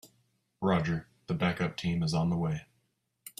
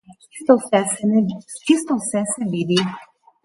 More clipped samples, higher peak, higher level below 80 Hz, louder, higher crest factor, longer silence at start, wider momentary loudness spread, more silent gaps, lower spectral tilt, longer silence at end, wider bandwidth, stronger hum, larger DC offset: neither; second, -14 dBFS vs -2 dBFS; first, -58 dBFS vs -64 dBFS; second, -31 LUFS vs -20 LUFS; about the same, 18 dB vs 18 dB; about the same, 0.05 s vs 0.1 s; second, 8 LU vs 11 LU; neither; first, -6.5 dB/octave vs -4.5 dB/octave; second, 0.1 s vs 0.4 s; first, 14.5 kHz vs 11.5 kHz; neither; neither